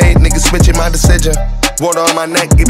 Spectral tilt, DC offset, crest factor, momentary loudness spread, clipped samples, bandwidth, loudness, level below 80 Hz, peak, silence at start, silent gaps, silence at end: -4.5 dB/octave; under 0.1%; 8 dB; 5 LU; under 0.1%; 16.5 kHz; -11 LUFS; -12 dBFS; 0 dBFS; 0 s; none; 0 s